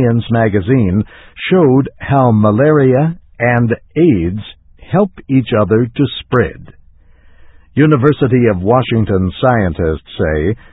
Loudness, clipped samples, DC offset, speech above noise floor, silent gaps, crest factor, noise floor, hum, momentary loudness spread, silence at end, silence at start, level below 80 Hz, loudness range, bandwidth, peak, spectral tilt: -13 LUFS; under 0.1%; under 0.1%; 31 dB; none; 12 dB; -43 dBFS; none; 8 LU; 0.2 s; 0 s; -32 dBFS; 4 LU; 4 kHz; 0 dBFS; -11.5 dB/octave